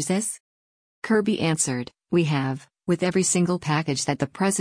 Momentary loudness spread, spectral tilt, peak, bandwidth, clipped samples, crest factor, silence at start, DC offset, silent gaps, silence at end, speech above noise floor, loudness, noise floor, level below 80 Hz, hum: 9 LU; -4.5 dB/octave; -10 dBFS; 10.5 kHz; under 0.1%; 14 dB; 0 s; under 0.1%; 0.40-1.02 s; 0 s; over 67 dB; -24 LUFS; under -90 dBFS; -60 dBFS; none